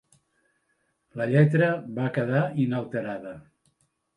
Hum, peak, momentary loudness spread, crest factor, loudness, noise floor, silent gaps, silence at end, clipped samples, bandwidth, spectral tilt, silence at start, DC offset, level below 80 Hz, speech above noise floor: none; -8 dBFS; 19 LU; 20 dB; -25 LUFS; -73 dBFS; none; 0.75 s; under 0.1%; 10.5 kHz; -9 dB/octave; 1.15 s; under 0.1%; -68 dBFS; 48 dB